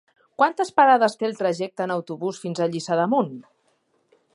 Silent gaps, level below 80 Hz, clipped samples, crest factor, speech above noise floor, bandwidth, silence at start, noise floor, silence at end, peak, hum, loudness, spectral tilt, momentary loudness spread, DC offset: none; -76 dBFS; under 0.1%; 20 dB; 45 dB; 11.5 kHz; 0.4 s; -67 dBFS; 0.95 s; -4 dBFS; none; -22 LUFS; -5.5 dB/octave; 13 LU; under 0.1%